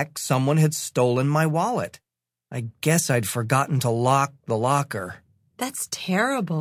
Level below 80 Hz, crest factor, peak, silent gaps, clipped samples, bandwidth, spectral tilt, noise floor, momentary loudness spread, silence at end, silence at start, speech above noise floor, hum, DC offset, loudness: -62 dBFS; 18 dB; -6 dBFS; none; under 0.1%; 16 kHz; -5 dB/octave; -55 dBFS; 11 LU; 0 s; 0 s; 33 dB; none; under 0.1%; -23 LUFS